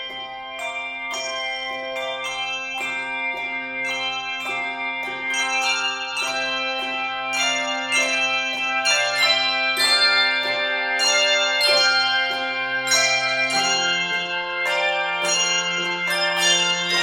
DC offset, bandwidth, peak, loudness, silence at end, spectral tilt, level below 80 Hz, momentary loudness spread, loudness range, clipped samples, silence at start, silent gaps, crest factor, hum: under 0.1%; 17 kHz; -6 dBFS; -20 LUFS; 0 s; 0 dB/octave; -64 dBFS; 9 LU; 8 LU; under 0.1%; 0 s; none; 18 dB; none